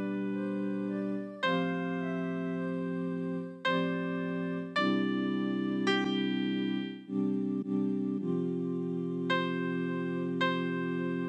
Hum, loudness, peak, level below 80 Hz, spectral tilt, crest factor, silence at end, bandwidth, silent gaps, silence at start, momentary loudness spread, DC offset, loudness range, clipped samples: none; -32 LUFS; -16 dBFS; -84 dBFS; -7 dB/octave; 16 dB; 0 s; 8.6 kHz; none; 0 s; 5 LU; under 0.1%; 2 LU; under 0.1%